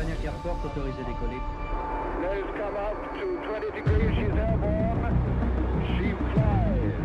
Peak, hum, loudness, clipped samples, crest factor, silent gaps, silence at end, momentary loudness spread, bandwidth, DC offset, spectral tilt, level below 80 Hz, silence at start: -12 dBFS; none; -28 LUFS; under 0.1%; 16 dB; none; 0 s; 8 LU; 7.4 kHz; under 0.1%; -9 dB/octave; -32 dBFS; 0 s